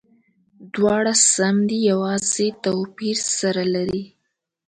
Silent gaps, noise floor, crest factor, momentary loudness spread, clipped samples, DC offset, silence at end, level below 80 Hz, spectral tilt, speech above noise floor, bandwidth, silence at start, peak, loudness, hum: none; -76 dBFS; 18 dB; 10 LU; under 0.1%; under 0.1%; 0.6 s; -58 dBFS; -3.5 dB/octave; 56 dB; 11 kHz; 0.6 s; -4 dBFS; -19 LUFS; none